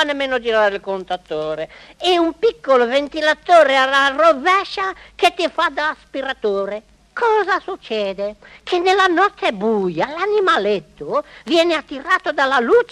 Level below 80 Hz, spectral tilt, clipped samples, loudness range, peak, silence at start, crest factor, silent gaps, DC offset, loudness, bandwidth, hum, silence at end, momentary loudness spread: -54 dBFS; -3.5 dB/octave; under 0.1%; 5 LU; 0 dBFS; 0 s; 18 dB; none; under 0.1%; -17 LUFS; 12.5 kHz; none; 0.05 s; 12 LU